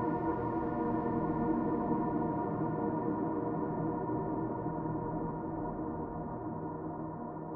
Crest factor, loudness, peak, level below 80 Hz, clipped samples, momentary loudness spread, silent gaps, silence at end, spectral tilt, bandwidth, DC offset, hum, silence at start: 14 dB; -35 LUFS; -20 dBFS; -54 dBFS; under 0.1%; 7 LU; none; 0 s; -10.5 dB/octave; 3 kHz; under 0.1%; none; 0 s